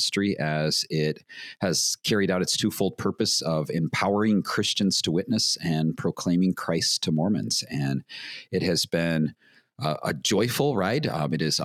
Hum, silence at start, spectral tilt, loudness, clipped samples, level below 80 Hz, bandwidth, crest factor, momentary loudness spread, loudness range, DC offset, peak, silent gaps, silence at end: none; 0 s; -4 dB/octave; -25 LUFS; under 0.1%; -62 dBFS; 16 kHz; 16 dB; 6 LU; 2 LU; under 0.1%; -8 dBFS; none; 0 s